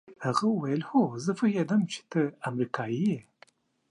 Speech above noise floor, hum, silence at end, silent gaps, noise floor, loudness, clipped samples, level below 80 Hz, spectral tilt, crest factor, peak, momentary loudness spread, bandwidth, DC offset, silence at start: 33 dB; none; 0.7 s; none; -61 dBFS; -29 LUFS; under 0.1%; -76 dBFS; -6.5 dB/octave; 18 dB; -10 dBFS; 5 LU; 10.5 kHz; under 0.1%; 0.1 s